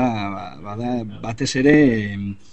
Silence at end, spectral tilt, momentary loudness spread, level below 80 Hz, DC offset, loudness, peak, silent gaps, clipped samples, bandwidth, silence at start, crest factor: 0.2 s; -6 dB/octave; 16 LU; -44 dBFS; 0.9%; -20 LUFS; 0 dBFS; none; under 0.1%; 8.6 kHz; 0 s; 18 dB